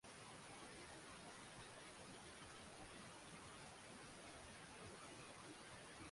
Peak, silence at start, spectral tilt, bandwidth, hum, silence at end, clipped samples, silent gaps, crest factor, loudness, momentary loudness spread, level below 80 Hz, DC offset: -46 dBFS; 0.05 s; -3 dB/octave; 11.5 kHz; none; 0 s; under 0.1%; none; 14 dB; -58 LUFS; 1 LU; -76 dBFS; under 0.1%